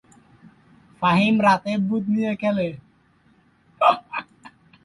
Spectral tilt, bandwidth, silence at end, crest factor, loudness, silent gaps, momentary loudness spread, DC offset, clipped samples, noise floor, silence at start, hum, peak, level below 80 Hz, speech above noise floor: -7 dB/octave; 11 kHz; 0.35 s; 20 dB; -21 LUFS; none; 13 LU; under 0.1%; under 0.1%; -59 dBFS; 1 s; none; -4 dBFS; -60 dBFS; 39 dB